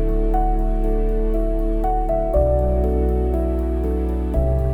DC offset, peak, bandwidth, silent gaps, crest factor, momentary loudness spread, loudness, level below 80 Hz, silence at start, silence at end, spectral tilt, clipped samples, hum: under 0.1%; -6 dBFS; 3.2 kHz; none; 12 dB; 4 LU; -21 LUFS; -20 dBFS; 0 s; 0 s; -10.5 dB/octave; under 0.1%; none